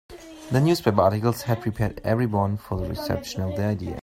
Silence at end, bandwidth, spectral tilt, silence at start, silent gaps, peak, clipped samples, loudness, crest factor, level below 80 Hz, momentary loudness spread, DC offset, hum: 0 s; 16 kHz; -7 dB/octave; 0.1 s; none; -4 dBFS; under 0.1%; -24 LUFS; 20 dB; -46 dBFS; 9 LU; under 0.1%; none